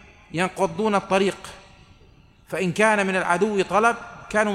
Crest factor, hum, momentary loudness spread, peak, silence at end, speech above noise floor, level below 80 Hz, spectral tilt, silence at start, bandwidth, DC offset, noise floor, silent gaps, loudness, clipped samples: 18 dB; none; 13 LU; -4 dBFS; 0 s; 31 dB; -54 dBFS; -5 dB/octave; 0.35 s; 14.5 kHz; under 0.1%; -52 dBFS; none; -22 LUFS; under 0.1%